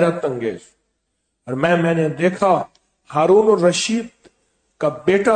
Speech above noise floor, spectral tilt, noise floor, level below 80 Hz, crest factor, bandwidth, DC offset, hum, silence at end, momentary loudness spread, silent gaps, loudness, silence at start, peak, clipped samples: 56 dB; -5.5 dB/octave; -72 dBFS; -60 dBFS; 16 dB; 9.4 kHz; under 0.1%; none; 0 s; 14 LU; none; -18 LUFS; 0 s; -4 dBFS; under 0.1%